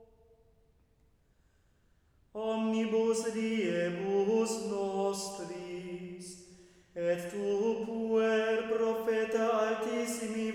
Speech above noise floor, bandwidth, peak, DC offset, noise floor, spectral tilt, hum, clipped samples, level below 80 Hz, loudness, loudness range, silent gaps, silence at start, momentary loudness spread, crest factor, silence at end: 37 dB; 16.5 kHz; -18 dBFS; under 0.1%; -68 dBFS; -4.5 dB/octave; none; under 0.1%; -70 dBFS; -32 LUFS; 5 LU; none; 0 s; 12 LU; 14 dB; 0 s